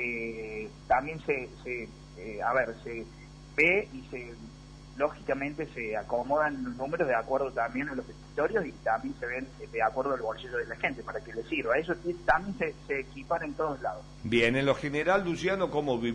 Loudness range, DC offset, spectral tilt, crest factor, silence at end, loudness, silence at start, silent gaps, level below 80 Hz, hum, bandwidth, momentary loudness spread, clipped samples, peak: 3 LU; under 0.1%; -6 dB/octave; 20 dB; 0 s; -31 LUFS; 0 s; none; -52 dBFS; none; 10.5 kHz; 13 LU; under 0.1%; -10 dBFS